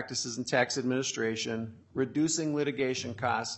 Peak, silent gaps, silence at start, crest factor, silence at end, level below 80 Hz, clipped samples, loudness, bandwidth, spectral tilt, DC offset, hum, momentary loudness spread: -12 dBFS; none; 0 s; 18 dB; 0 s; -72 dBFS; under 0.1%; -31 LUFS; 8.4 kHz; -3.5 dB/octave; under 0.1%; none; 6 LU